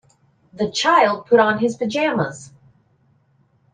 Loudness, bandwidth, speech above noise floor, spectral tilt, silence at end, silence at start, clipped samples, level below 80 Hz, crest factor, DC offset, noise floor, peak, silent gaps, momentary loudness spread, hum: -18 LUFS; 9.6 kHz; 42 dB; -4.5 dB/octave; 1.3 s; 0.6 s; under 0.1%; -64 dBFS; 18 dB; under 0.1%; -60 dBFS; -2 dBFS; none; 11 LU; none